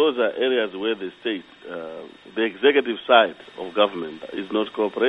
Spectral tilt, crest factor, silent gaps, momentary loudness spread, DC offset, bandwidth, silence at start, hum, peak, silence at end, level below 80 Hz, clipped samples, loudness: -6 dB/octave; 22 dB; none; 17 LU; under 0.1%; 5.6 kHz; 0 s; none; 0 dBFS; 0 s; -68 dBFS; under 0.1%; -22 LUFS